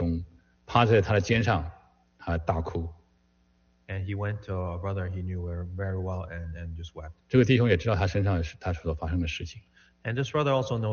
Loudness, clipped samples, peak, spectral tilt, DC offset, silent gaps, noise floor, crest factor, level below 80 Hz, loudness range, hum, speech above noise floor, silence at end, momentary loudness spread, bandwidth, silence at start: -28 LUFS; under 0.1%; -8 dBFS; -6 dB/octave; under 0.1%; none; -66 dBFS; 20 dB; -44 dBFS; 7 LU; none; 39 dB; 0 s; 17 LU; 6.8 kHz; 0 s